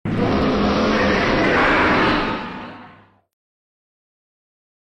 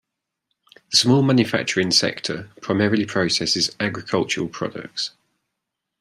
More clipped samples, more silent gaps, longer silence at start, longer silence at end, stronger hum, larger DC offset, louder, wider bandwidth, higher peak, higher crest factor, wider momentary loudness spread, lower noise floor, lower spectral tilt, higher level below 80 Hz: neither; neither; second, 0.05 s vs 0.9 s; first, 2 s vs 0.9 s; neither; neither; first, -17 LUFS vs -20 LUFS; second, 9.4 kHz vs 14.5 kHz; second, -6 dBFS vs -2 dBFS; second, 14 dB vs 20 dB; about the same, 14 LU vs 12 LU; second, -47 dBFS vs -81 dBFS; first, -6 dB/octave vs -4 dB/octave; first, -36 dBFS vs -62 dBFS